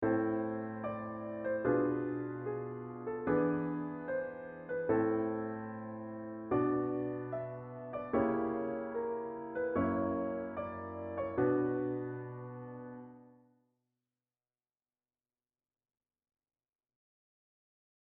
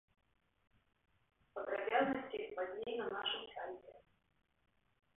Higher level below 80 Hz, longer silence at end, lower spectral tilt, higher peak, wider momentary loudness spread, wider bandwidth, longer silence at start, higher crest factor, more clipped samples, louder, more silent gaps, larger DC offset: first, -68 dBFS vs -78 dBFS; first, 4.7 s vs 1.15 s; first, -8.5 dB/octave vs 1 dB/octave; first, -18 dBFS vs -22 dBFS; about the same, 12 LU vs 13 LU; about the same, 3.8 kHz vs 3.9 kHz; second, 0 s vs 1.55 s; about the same, 18 dB vs 22 dB; neither; first, -36 LUFS vs -41 LUFS; neither; neither